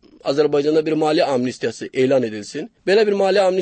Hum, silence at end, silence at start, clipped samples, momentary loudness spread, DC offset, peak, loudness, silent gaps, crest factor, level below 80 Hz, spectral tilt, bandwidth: none; 0 s; 0.25 s; under 0.1%; 10 LU; under 0.1%; -6 dBFS; -18 LUFS; none; 12 dB; -66 dBFS; -5.5 dB/octave; 8.8 kHz